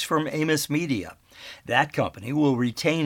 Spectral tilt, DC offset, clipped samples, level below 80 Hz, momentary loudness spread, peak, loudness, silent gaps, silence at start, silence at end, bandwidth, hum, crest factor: -5 dB/octave; under 0.1%; under 0.1%; -60 dBFS; 18 LU; -6 dBFS; -25 LUFS; none; 0 s; 0 s; 18.5 kHz; none; 20 dB